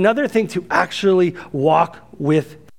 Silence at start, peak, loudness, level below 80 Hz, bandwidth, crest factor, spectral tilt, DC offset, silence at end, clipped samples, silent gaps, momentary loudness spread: 0 s; 0 dBFS; -18 LUFS; -58 dBFS; 15 kHz; 18 dB; -6.5 dB/octave; 0.3%; 0.25 s; under 0.1%; none; 5 LU